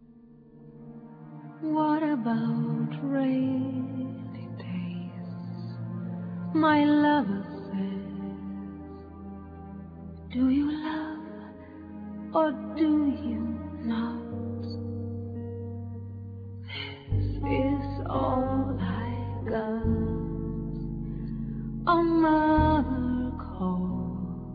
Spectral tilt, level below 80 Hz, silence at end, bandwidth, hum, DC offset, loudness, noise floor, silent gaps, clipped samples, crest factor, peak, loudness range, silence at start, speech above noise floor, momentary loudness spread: -10.5 dB/octave; -44 dBFS; 0 s; 5 kHz; none; under 0.1%; -29 LUFS; -53 dBFS; none; under 0.1%; 18 dB; -10 dBFS; 8 LU; 0 s; 27 dB; 19 LU